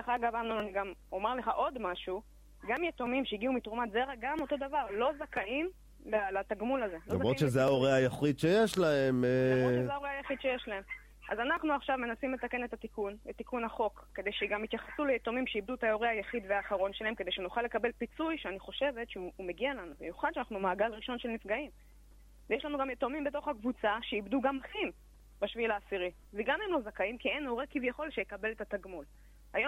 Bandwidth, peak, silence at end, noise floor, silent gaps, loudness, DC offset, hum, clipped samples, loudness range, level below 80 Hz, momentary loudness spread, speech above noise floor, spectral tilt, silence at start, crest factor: 16 kHz; -14 dBFS; 0 s; -57 dBFS; none; -34 LUFS; under 0.1%; 50 Hz at -60 dBFS; under 0.1%; 7 LU; -58 dBFS; 11 LU; 23 dB; -6 dB/octave; 0 s; 20 dB